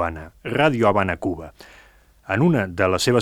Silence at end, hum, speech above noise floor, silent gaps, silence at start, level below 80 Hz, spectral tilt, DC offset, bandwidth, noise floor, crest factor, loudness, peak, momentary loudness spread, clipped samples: 0 s; none; 31 dB; none; 0 s; -46 dBFS; -5.5 dB/octave; under 0.1%; 15 kHz; -52 dBFS; 18 dB; -20 LUFS; -2 dBFS; 14 LU; under 0.1%